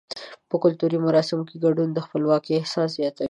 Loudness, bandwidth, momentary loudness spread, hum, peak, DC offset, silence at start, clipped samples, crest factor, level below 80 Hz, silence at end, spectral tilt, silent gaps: -23 LUFS; 11 kHz; 7 LU; none; -8 dBFS; under 0.1%; 0.15 s; under 0.1%; 16 dB; -68 dBFS; 0 s; -7 dB/octave; none